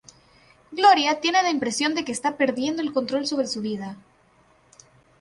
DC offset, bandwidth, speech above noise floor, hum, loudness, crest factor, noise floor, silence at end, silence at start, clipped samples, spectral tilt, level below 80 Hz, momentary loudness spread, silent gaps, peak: under 0.1%; 11.5 kHz; 36 dB; none; -22 LUFS; 20 dB; -59 dBFS; 1.2 s; 0.7 s; under 0.1%; -3 dB/octave; -66 dBFS; 12 LU; none; -6 dBFS